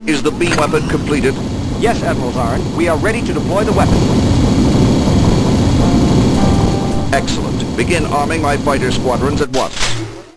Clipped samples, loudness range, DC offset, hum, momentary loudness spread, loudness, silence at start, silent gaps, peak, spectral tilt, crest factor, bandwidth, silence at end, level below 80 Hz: under 0.1%; 3 LU; under 0.1%; none; 5 LU; -14 LUFS; 0 s; none; 0 dBFS; -6 dB/octave; 12 dB; 11 kHz; 0.1 s; -24 dBFS